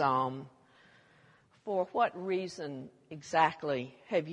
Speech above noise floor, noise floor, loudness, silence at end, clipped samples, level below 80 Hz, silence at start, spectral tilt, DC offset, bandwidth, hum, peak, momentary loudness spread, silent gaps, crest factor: 31 dB; -64 dBFS; -33 LUFS; 0 s; under 0.1%; -78 dBFS; 0 s; -5.5 dB/octave; under 0.1%; 11 kHz; none; -12 dBFS; 18 LU; none; 22 dB